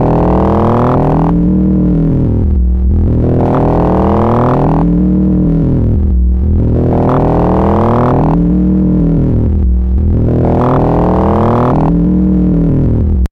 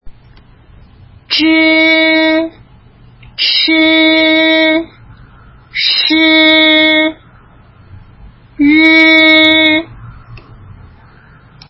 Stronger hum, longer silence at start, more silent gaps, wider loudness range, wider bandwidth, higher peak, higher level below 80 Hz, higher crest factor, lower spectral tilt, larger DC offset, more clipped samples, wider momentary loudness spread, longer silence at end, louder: neither; about the same, 0 s vs 0.05 s; neither; second, 0 LU vs 3 LU; second, 4.7 kHz vs 5.8 kHz; about the same, -2 dBFS vs 0 dBFS; first, -16 dBFS vs -44 dBFS; second, 6 dB vs 12 dB; first, -11 dB/octave vs -5.5 dB/octave; neither; neither; second, 2 LU vs 11 LU; second, 0.05 s vs 1.3 s; second, -11 LUFS vs -7 LUFS